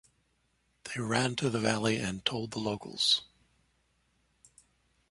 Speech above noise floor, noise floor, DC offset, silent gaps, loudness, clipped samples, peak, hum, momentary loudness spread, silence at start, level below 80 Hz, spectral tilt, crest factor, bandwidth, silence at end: 43 dB; -74 dBFS; under 0.1%; none; -30 LUFS; under 0.1%; -12 dBFS; none; 10 LU; 0.85 s; -64 dBFS; -4 dB/octave; 22 dB; 11.5 kHz; 1.85 s